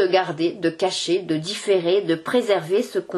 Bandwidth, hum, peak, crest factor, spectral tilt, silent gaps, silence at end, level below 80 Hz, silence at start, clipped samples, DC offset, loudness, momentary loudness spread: 12.5 kHz; none; -4 dBFS; 16 dB; -4.5 dB/octave; none; 0 s; -70 dBFS; 0 s; under 0.1%; under 0.1%; -22 LUFS; 4 LU